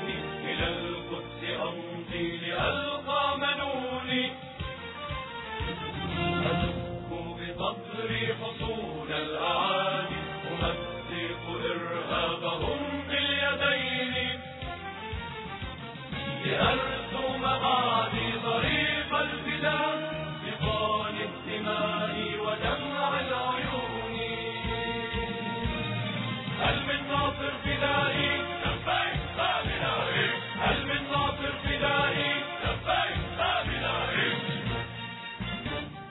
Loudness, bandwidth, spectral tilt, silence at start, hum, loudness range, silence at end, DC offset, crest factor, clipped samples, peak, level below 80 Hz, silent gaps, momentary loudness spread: -30 LUFS; 4.1 kHz; -8 dB/octave; 0 s; none; 4 LU; 0 s; under 0.1%; 18 dB; under 0.1%; -12 dBFS; -46 dBFS; none; 10 LU